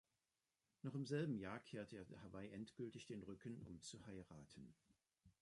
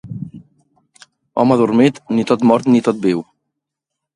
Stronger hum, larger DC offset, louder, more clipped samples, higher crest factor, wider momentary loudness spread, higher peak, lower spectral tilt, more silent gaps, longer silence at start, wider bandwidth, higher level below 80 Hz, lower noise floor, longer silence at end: neither; neither; second, -53 LUFS vs -15 LUFS; neither; about the same, 20 dB vs 16 dB; about the same, 15 LU vs 16 LU; second, -32 dBFS vs 0 dBFS; about the same, -6 dB/octave vs -7 dB/octave; neither; first, 0.85 s vs 0.05 s; about the same, 11 kHz vs 10.5 kHz; second, -78 dBFS vs -58 dBFS; first, under -90 dBFS vs -80 dBFS; second, 0.1 s vs 0.95 s